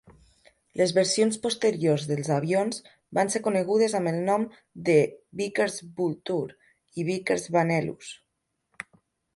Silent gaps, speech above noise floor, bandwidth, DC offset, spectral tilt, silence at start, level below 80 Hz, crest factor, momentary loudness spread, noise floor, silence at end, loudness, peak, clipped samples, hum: none; 53 dB; 11.5 kHz; under 0.1%; -5 dB/octave; 0.1 s; -68 dBFS; 18 dB; 16 LU; -79 dBFS; 1.2 s; -26 LUFS; -8 dBFS; under 0.1%; none